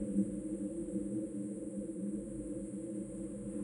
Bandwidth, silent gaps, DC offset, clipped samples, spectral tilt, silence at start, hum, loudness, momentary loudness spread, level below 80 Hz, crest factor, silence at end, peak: 11 kHz; none; under 0.1%; under 0.1%; -8 dB/octave; 0 s; none; -41 LUFS; 5 LU; -60 dBFS; 18 dB; 0 s; -22 dBFS